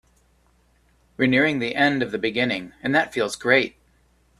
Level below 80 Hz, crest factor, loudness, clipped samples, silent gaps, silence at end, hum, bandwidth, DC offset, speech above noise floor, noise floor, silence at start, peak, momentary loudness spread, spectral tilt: -58 dBFS; 22 dB; -21 LUFS; under 0.1%; none; 0.7 s; none; 13 kHz; under 0.1%; 40 dB; -61 dBFS; 1.2 s; -2 dBFS; 6 LU; -5 dB/octave